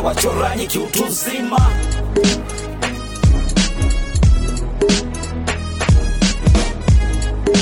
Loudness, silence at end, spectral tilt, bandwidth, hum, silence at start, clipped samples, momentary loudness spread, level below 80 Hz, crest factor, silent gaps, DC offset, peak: -17 LUFS; 0 s; -5 dB/octave; 19.5 kHz; none; 0 s; under 0.1%; 7 LU; -18 dBFS; 12 dB; none; under 0.1%; -4 dBFS